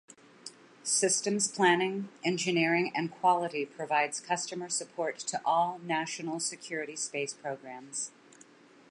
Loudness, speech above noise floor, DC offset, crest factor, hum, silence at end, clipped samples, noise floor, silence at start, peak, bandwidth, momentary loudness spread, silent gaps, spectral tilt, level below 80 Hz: -31 LUFS; 26 dB; under 0.1%; 22 dB; none; 0.8 s; under 0.1%; -57 dBFS; 0.45 s; -10 dBFS; 11.5 kHz; 13 LU; none; -3 dB/octave; -84 dBFS